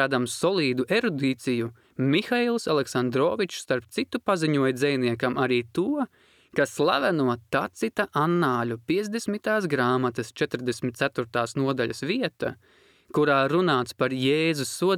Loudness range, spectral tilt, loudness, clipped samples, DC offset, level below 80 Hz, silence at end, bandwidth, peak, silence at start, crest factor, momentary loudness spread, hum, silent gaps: 2 LU; -5.5 dB/octave; -25 LUFS; under 0.1%; under 0.1%; -66 dBFS; 0 s; 16 kHz; -8 dBFS; 0 s; 18 dB; 6 LU; none; none